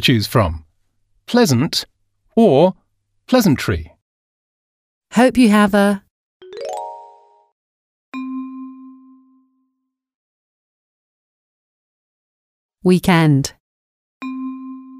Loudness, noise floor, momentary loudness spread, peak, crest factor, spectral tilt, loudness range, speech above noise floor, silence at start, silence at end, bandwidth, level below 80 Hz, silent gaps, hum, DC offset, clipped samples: -16 LUFS; -74 dBFS; 20 LU; 0 dBFS; 18 dB; -6 dB/octave; 18 LU; 61 dB; 0 s; 0 s; 15.5 kHz; -44 dBFS; 4.02-5.02 s, 6.11-6.40 s, 7.52-8.12 s, 10.15-12.69 s, 13.60-14.21 s; none; under 0.1%; under 0.1%